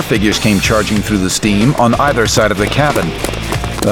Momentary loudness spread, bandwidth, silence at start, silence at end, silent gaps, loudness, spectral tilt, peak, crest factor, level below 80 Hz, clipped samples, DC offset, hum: 7 LU; over 20 kHz; 0 s; 0 s; none; -13 LUFS; -4.5 dB/octave; 0 dBFS; 12 dB; -28 dBFS; under 0.1%; 0.2%; none